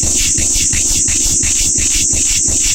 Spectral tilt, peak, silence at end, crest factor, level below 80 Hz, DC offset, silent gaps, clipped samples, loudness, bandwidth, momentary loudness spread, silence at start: -0.5 dB/octave; -2 dBFS; 0 s; 12 dB; -24 dBFS; under 0.1%; none; under 0.1%; -10 LUFS; 17 kHz; 0 LU; 0 s